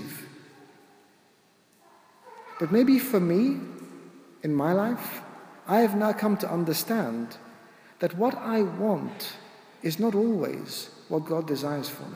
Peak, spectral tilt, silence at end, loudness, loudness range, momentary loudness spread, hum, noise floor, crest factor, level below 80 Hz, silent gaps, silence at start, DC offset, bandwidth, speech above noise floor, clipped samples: -10 dBFS; -6 dB/octave; 0 s; -27 LUFS; 3 LU; 20 LU; none; -62 dBFS; 18 dB; -78 dBFS; none; 0 s; under 0.1%; 16 kHz; 36 dB; under 0.1%